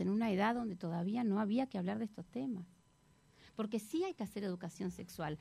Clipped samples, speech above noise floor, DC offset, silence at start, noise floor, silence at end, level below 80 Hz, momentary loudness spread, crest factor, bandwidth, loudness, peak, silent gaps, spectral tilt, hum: under 0.1%; 31 dB; under 0.1%; 0 s; -69 dBFS; 0 s; -70 dBFS; 10 LU; 16 dB; 14.5 kHz; -39 LUFS; -22 dBFS; none; -7 dB/octave; none